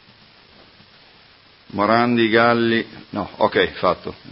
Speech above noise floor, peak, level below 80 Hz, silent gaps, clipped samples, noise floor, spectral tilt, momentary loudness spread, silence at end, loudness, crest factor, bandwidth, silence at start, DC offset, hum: 32 dB; 0 dBFS; -52 dBFS; none; under 0.1%; -50 dBFS; -10 dB/octave; 14 LU; 0.15 s; -19 LUFS; 20 dB; 5.8 kHz; 1.75 s; under 0.1%; none